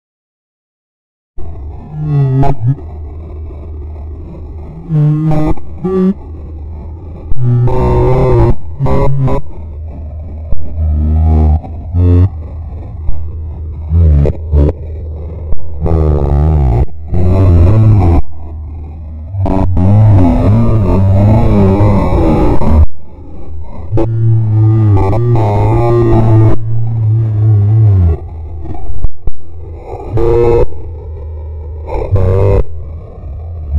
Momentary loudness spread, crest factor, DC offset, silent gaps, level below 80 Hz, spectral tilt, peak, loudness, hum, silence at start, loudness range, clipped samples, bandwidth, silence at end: 18 LU; 10 dB; under 0.1%; none; -18 dBFS; -11 dB/octave; 0 dBFS; -11 LUFS; none; 1.4 s; 7 LU; 0.7%; 5.4 kHz; 0 s